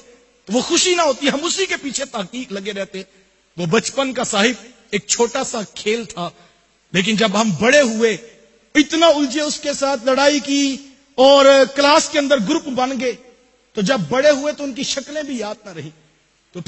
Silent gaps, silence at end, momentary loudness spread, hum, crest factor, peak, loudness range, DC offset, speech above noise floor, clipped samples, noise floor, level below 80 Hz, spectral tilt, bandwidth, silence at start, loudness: none; 0.05 s; 15 LU; none; 18 dB; 0 dBFS; 7 LU; under 0.1%; 40 dB; under 0.1%; -57 dBFS; -56 dBFS; -3 dB/octave; 8.6 kHz; 0.5 s; -17 LUFS